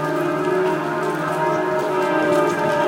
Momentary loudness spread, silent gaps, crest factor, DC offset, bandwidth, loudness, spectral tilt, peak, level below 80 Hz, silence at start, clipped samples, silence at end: 4 LU; none; 14 dB; under 0.1%; 16.5 kHz; -20 LUFS; -6 dB/octave; -6 dBFS; -62 dBFS; 0 s; under 0.1%; 0 s